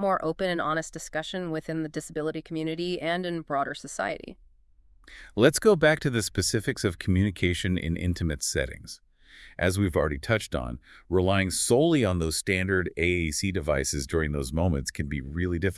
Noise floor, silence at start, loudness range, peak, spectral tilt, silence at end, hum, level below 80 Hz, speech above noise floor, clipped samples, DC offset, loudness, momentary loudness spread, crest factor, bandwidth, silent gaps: -59 dBFS; 0 s; 6 LU; -6 dBFS; -5 dB/octave; 0 s; none; -44 dBFS; 32 dB; under 0.1%; under 0.1%; -27 LUFS; 11 LU; 22 dB; 12 kHz; none